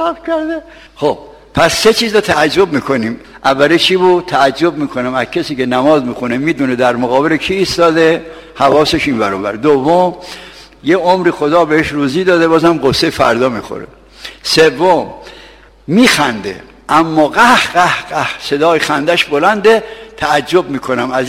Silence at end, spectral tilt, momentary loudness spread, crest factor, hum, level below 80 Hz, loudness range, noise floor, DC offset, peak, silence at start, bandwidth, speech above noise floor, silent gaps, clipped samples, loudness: 0 s; -4.5 dB/octave; 12 LU; 12 dB; none; -42 dBFS; 2 LU; -39 dBFS; under 0.1%; 0 dBFS; 0 s; 16.5 kHz; 27 dB; none; 0.2%; -12 LUFS